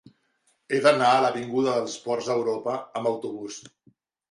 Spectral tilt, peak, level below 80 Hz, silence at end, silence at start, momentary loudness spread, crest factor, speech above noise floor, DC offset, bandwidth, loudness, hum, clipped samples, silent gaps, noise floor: -4.5 dB/octave; -4 dBFS; -74 dBFS; 0.65 s; 0.7 s; 14 LU; 20 dB; 45 dB; under 0.1%; 11.5 kHz; -24 LUFS; none; under 0.1%; none; -69 dBFS